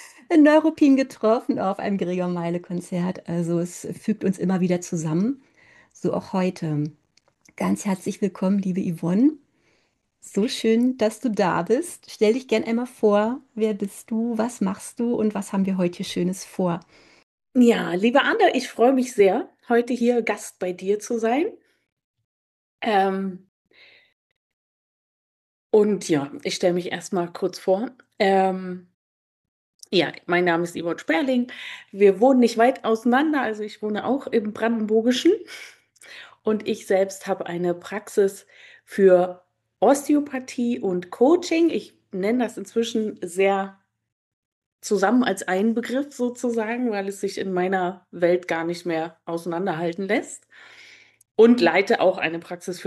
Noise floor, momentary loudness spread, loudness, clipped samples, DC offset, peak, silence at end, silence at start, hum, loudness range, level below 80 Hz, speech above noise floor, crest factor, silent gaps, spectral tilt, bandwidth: -68 dBFS; 11 LU; -22 LUFS; under 0.1%; under 0.1%; -4 dBFS; 0 s; 0 s; none; 6 LU; -70 dBFS; 46 dB; 18 dB; 17.23-17.38 s, 21.92-21.97 s, 22.04-22.14 s, 22.24-22.78 s, 23.48-23.65 s, 24.13-25.70 s, 28.94-29.79 s, 44.12-44.79 s; -5.5 dB/octave; 12.5 kHz